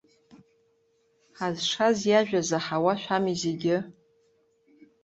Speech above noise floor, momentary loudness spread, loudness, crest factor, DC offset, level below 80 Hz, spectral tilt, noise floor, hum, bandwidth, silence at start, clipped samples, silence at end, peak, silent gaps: 43 dB; 8 LU; -26 LUFS; 20 dB; under 0.1%; -68 dBFS; -4.5 dB/octave; -68 dBFS; none; 8.2 kHz; 1.4 s; under 0.1%; 1.1 s; -8 dBFS; none